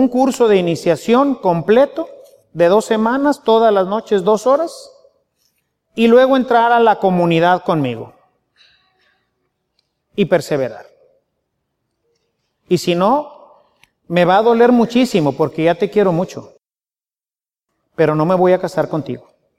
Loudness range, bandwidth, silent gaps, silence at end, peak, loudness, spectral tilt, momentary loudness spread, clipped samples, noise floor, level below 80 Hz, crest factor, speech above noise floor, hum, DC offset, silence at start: 9 LU; 14.5 kHz; none; 0.4 s; 0 dBFS; -14 LUFS; -6.5 dB/octave; 13 LU; under 0.1%; under -90 dBFS; -58 dBFS; 14 dB; over 76 dB; none; under 0.1%; 0 s